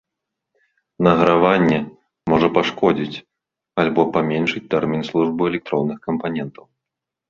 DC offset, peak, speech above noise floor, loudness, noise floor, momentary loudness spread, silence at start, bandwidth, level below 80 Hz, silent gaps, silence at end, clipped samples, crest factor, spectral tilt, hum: under 0.1%; 0 dBFS; 66 dB; -19 LUFS; -84 dBFS; 13 LU; 1 s; 7.4 kHz; -52 dBFS; none; 0.8 s; under 0.1%; 20 dB; -7.5 dB/octave; none